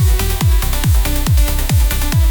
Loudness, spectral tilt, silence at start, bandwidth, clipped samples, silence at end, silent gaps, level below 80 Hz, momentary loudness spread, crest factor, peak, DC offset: -15 LUFS; -4.5 dB/octave; 0 s; 19.5 kHz; under 0.1%; 0 s; none; -14 dBFS; 1 LU; 8 dB; -4 dBFS; under 0.1%